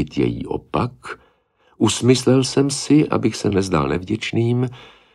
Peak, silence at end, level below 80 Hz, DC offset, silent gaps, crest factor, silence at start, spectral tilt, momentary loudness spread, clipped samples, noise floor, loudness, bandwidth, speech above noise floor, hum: -2 dBFS; 0.3 s; -44 dBFS; under 0.1%; none; 18 dB; 0 s; -5.5 dB/octave; 11 LU; under 0.1%; -59 dBFS; -19 LUFS; 13 kHz; 41 dB; none